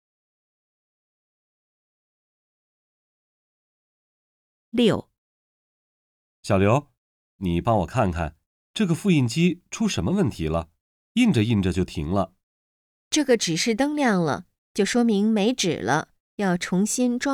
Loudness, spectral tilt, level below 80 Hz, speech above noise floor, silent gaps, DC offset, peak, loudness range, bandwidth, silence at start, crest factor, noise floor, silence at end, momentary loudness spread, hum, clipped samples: -23 LUFS; -5.5 dB/octave; -48 dBFS; over 68 dB; 5.18-6.43 s, 6.97-7.39 s, 8.46-8.74 s, 10.81-11.15 s, 12.43-13.11 s, 14.58-14.75 s, 16.20-16.38 s; under 0.1%; -6 dBFS; 8 LU; 15.5 kHz; 4.75 s; 18 dB; under -90 dBFS; 0 s; 9 LU; none; under 0.1%